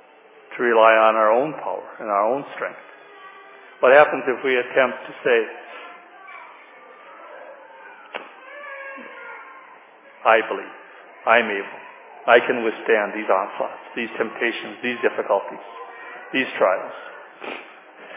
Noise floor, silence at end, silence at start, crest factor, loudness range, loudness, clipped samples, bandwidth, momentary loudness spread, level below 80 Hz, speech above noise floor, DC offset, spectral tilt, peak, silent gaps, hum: -49 dBFS; 0 s; 0.5 s; 22 dB; 18 LU; -20 LUFS; under 0.1%; 3.9 kHz; 25 LU; -88 dBFS; 29 dB; under 0.1%; -7.5 dB/octave; 0 dBFS; none; none